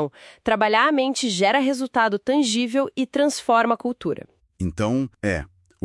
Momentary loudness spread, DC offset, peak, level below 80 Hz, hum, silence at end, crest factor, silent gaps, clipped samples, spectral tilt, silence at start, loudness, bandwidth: 11 LU; under 0.1%; -4 dBFS; -50 dBFS; none; 0.4 s; 18 dB; none; under 0.1%; -4.5 dB/octave; 0 s; -22 LUFS; 12 kHz